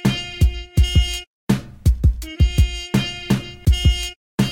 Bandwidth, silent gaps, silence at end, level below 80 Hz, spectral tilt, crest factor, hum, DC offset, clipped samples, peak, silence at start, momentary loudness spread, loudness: 16.5 kHz; 1.27-1.47 s, 4.16-4.38 s; 0 s; -22 dBFS; -5.5 dB/octave; 14 dB; none; under 0.1%; under 0.1%; -4 dBFS; 0 s; 5 LU; -20 LUFS